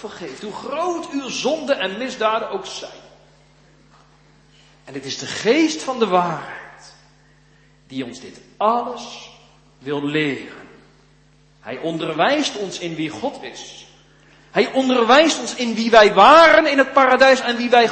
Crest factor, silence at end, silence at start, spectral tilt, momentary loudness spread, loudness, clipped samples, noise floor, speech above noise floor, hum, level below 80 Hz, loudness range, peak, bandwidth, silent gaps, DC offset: 20 dB; 0 s; 0 s; -3.5 dB/octave; 21 LU; -17 LUFS; under 0.1%; -53 dBFS; 36 dB; none; -56 dBFS; 14 LU; 0 dBFS; 8.8 kHz; none; under 0.1%